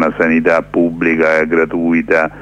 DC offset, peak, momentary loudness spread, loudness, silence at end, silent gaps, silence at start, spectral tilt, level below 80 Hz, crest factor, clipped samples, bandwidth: under 0.1%; 0 dBFS; 3 LU; -13 LUFS; 0 s; none; 0 s; -7.5 dB/octave; -44 dBFS; 12 dB; under 0.1%; 8 kHz